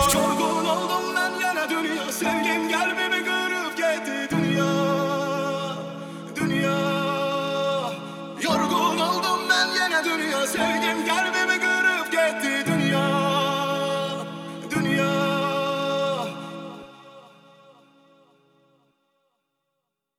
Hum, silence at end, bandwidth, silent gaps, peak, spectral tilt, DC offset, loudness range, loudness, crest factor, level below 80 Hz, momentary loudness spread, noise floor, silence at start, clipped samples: none; 2.9 s; 19.5 kHz; none; -6 dBFS; -4 dB/octave; under 0.1%; 5 LU; -23 LUFS; 18 dB; -56 dBFS; 9 LU; -80 dBFS; 0 s; under 0.1%